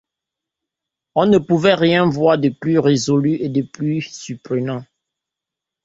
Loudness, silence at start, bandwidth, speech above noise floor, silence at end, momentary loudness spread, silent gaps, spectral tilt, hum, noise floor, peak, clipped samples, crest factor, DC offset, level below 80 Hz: -17 LUFS; 1.15 s; 8 kHz; 69 dB; 1 s; 11 LU; none; -6 dB/octave; none; -85 dBFS; -2 dBFS; under 0.1%; 16 dB; under 0.1%; -56 dBFS